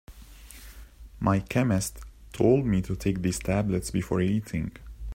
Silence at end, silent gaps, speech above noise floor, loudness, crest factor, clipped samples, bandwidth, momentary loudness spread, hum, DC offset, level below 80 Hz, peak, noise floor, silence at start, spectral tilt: 0 s; none; 21 dB; -27 LUFS; 20 dB; under 0.1%; 16 kHz; 22 LU; none; under 0.1%; -44 dBFS; -8 dBFS; -47 dBFS; 0.1 s; -6.5 dB/octave